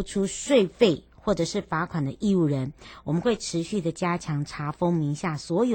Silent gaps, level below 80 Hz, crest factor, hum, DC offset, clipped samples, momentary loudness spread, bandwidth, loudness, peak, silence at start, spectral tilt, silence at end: none; -52 dBFS; 20 dB; none; under 0.1%; under 0.1%; 8 LU; 16.5 kHz; -26 LUFS; -6 dBFS; 0 s; -6 dB/octave; 0 s